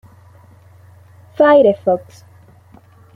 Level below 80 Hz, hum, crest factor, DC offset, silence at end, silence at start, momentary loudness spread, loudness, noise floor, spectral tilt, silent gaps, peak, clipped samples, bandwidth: -62 dBFS; none; 16 dB; under 0.1%; 1.15 s; 1.4 s; 13 LU; -13 LUFS; -46 dBFS; -7 dB/octave; none; -2 dBFS; under 0.1%; 6.2 kHz